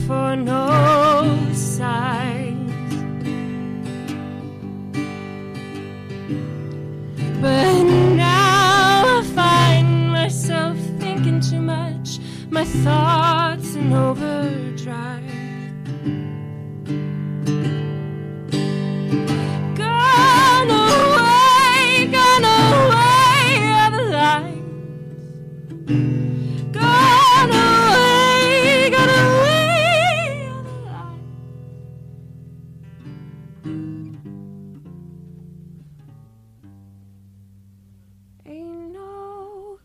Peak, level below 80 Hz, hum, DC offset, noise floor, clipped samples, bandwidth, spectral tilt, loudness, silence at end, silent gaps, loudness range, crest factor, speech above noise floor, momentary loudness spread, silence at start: -8 dBFS; -48 dBFS; none; under 0.1%; -50 dBFS; under 0.1%; 15.5 kHz; -5 dB/octave; -16 LUFS; 0.1 s; none; 22 LU; 10 dB; 33 dB; 21 LU; 0 s